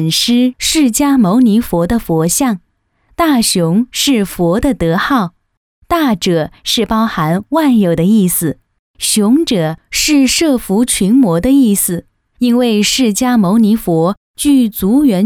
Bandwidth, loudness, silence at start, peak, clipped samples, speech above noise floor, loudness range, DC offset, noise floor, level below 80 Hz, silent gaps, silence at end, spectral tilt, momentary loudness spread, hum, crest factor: 19.5 kHz; -12 LUFS; 0 s; -2 dBFS; under 0.1%; 44 dB; 3 LU; under 0.1%; -55 dBFS; -36 dBFS; 5.57-5.82 s, 8.79-8.94 s, 14.17-14.34 s; 0 s; -4.5 dB/octave; 6 LU; none; 10 dB